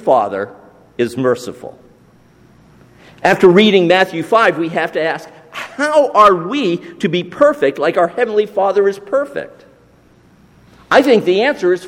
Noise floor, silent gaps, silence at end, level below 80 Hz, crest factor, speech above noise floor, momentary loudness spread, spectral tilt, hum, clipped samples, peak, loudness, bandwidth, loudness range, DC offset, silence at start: -48 dBFS; none; 0 s; -56 dBFS; 14 dB; 35 dB; 18 LU; -5.5 dB/octave; none; under 0.1%; 0 dBFS; -14 LUFS; 16 kHz; 5 LU; under 0.1%; 0.05 s